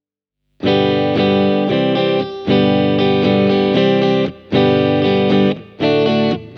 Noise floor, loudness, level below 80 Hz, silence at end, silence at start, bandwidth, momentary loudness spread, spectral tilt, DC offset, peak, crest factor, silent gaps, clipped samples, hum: -75 dBFS; -15 LUFS; -54 dBFS; 0 s; 0.6 s; 6.6 kHz; 4 LU; -8 dB/octave; under 0.1%; -2 dBFS; 12 dB; none; under 0.1%; 50 Hz at -40 dBFS